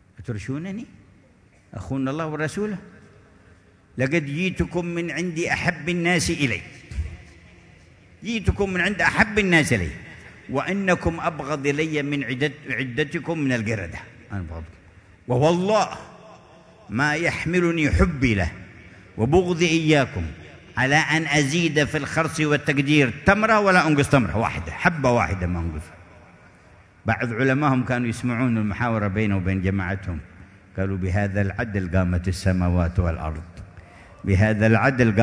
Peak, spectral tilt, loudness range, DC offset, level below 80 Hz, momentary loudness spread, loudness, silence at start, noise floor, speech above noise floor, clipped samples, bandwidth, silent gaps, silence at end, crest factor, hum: -2 dBFS; -6 dB/octave; 7 LU; under 0.1%; -40 dBFS; 16 LU; -22 LUFS; 0.2 s; -55 dBFS; 33 dB; under 0.1%; 11 kHz; none; 0 s; 20 dB; none